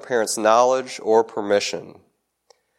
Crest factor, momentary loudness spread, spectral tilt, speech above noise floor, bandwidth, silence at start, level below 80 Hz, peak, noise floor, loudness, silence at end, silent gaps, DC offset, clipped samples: 18 dB; 9 LU; -2.5 dB/octave; 41 dB; 16 kHz; 0.05 s; -74 dBFS; -2 dBFS; -61 dBFS; -20 LUFS; 0.85 s; none; under 0.1%; under 0.1%